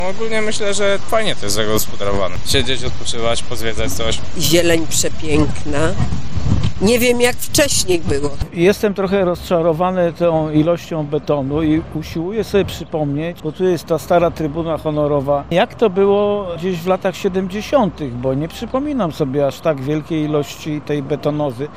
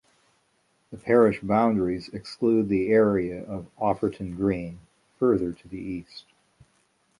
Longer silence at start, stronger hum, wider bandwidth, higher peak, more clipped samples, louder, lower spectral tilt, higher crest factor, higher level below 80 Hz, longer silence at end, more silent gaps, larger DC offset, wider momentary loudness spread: second, 0 s vs 0.9 s; neither; first, 16 kHz vs 11 kHz; first, -2 dBFS vs -6 dBFS; neither; first, -18 LUFS vs -25 LUFS; second, -4.5 dB/octave vs -8 dB/octave; second, 14 dB vs 20 dB; first, -34 dBFS vs -54 dBFS; second, 0 s vs 1 s; neither; neither; second, 7 LU vs 17 LU